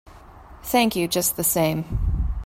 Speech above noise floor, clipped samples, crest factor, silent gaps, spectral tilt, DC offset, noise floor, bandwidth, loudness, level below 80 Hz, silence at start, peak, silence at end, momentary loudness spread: 23 dB; under 0.1%; 18 dB; none; -4 dB/octave; under 0.1%; -44 dBFS; 16.5 kHz; -22 LUFS; -30 dBFS; 0.05 s; -6 dBFS; 0 s; 6 LU